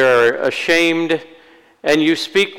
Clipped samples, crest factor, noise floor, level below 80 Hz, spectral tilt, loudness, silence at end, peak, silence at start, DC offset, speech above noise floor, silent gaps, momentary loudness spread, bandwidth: under 0.1%; 10 dB; -47 dBFS; -58 dBFS; -4 dB/octave; -16 LUFS; 0 s; -6 dBFS; 0 s; under 0.1%; 31 dB; none; 7 LU; 18 kHz